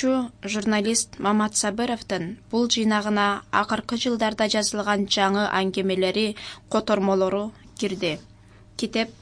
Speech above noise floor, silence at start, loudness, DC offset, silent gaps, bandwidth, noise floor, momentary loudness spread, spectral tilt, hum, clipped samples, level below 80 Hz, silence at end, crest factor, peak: 21 dB; 0 s; -24 LUFS; under 0.1%; none; 10.5 kHz; -45 dBFS; 8 LU; -3.5 dB/octave; none; under 0.1%; -56 dBFS; 0.05 s; 20 dB; -4 dBFS